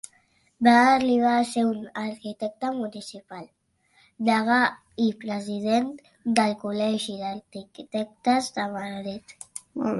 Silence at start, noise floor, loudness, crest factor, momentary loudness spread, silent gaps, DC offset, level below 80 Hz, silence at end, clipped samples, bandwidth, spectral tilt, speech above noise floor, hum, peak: 0.6 s; -64 dBFS; -25 LUFS; 20 dB; 20 LU; none; under 0.1%; -68 dBFS; 0 s; under 0.1%; 11.5 kHz; -4.5 dB/octave; 39 dB; none; -6 dBFS